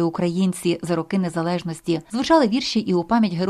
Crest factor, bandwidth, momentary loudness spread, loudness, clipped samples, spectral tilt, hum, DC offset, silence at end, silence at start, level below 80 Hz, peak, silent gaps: 16 dB; 13.5 kHz; 8 LU; -21 LUFS; under 0.1%; -6 dB/octave; none; under 0.1%; 0 s; 0 s; -54 dBFS; -4 dBFS; none